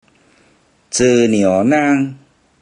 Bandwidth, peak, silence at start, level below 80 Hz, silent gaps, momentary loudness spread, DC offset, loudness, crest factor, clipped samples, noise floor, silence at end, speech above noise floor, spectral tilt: 10.5 kHz; -2 dBFS; 0.9 s; -54 dBFS; none; 8 LU; under 0.1%; -14 LUFS; 14 dB; under 0.1%; -54 dBFS; 0.45 s; 42 dB; -5 dB/octave